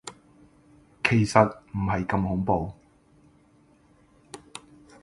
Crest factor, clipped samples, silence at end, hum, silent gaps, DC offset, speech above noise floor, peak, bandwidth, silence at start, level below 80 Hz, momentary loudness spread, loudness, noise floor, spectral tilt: 26 dB; under 0.1%; 0.45 s; none; none; under 0.1%; 36 dB; -2 dBFS; 11.5 kHz; 0.05 s; -48 dBFS; 24 LU; -25 LUFS; -59 dBFS; -6.5 dB/octave